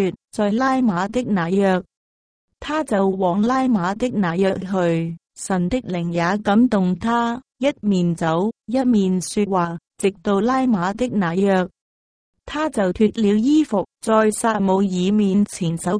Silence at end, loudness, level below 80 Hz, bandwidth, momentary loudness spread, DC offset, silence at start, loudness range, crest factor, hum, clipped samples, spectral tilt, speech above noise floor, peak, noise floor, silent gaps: 0 s; -20 LUFS; -50 dBFS; 10.5 kHz; 6 LU; under 0.1%; 0 s; 2 LU; 16 dB; none; under 0.1%; -6.5 dB/octave; over 71 dB; -4 dBFS; under -90 dBFS; 1.97-2.48 s, 11.81-12.33 s